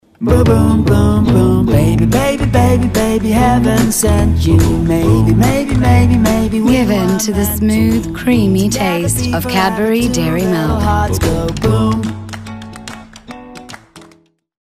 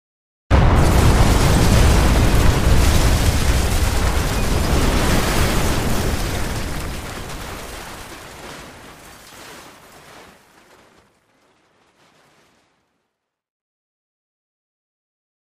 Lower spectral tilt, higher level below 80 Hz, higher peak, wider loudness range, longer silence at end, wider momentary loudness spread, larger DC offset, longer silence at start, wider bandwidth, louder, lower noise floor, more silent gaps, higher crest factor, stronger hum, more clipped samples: about the same, -6 dB/octave vs -5 dB/octave; about the same, -24 dBFS vs -22 dBFS; about the same, 0 dBFS vs -2 dBFS; second, 5 LU vs 21 LU; second, 0.6 s vs 3.1 s; second, 16 LU vs 22 LU; neither; second, 0.2 s vs 0.5 s; about the same, 15.5 kHz vs 15.5 kHz; first, -12 LUFS vs -18 LUFS; second, -49 dBFS vs -76 dBFS; neither; second, 12 dB vs 18 dB; neither; neither